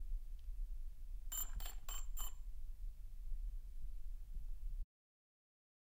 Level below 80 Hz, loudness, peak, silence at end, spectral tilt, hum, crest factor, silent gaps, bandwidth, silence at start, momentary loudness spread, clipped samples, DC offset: -46 dBFS; -51 LUFS; -30 dBFS; 1 s; -2 dB/octave; none; 14 dB; none; 16 kHz; 0 s; 11 LU; under 0.1%; under 0.1%